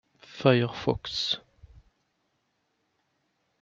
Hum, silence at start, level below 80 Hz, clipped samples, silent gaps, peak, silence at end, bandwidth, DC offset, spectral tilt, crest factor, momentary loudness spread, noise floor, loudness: none; 0.3 s; -58 dBFS; under 0.1%; none; -6 dBFS; 2.25 s; 7.6 kHz; under 0.1%; -6 dB/octave; 26 dB; 9 LU; -76 dBFS; -27 LUFS